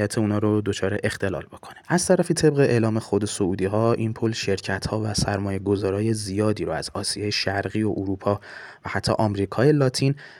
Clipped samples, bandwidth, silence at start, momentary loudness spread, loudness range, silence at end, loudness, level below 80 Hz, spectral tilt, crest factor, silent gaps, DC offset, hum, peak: under 0.1%; 16 kHz; 0 s; 7 LU; 3 LU; 0 s; -23 LUFS; -50 dBFS; -5.5 dB/octave; 18 dB; none; under 0.1%; none; -6 dBFS